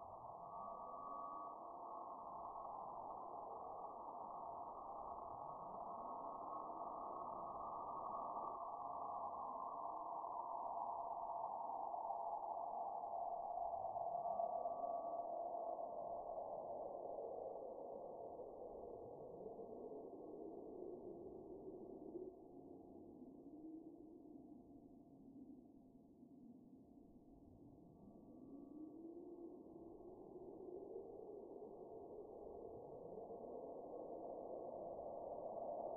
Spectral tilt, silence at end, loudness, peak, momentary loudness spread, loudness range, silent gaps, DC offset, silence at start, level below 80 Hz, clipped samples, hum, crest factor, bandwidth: 4.5 dB/octave; 0 s; -51 LUFS; -32 dBFS; 14 LU; 14 LU; none; under 0.1%; 0 s; -78 dBFS; under 0.1%; none; 18 dB; 1.5 kHz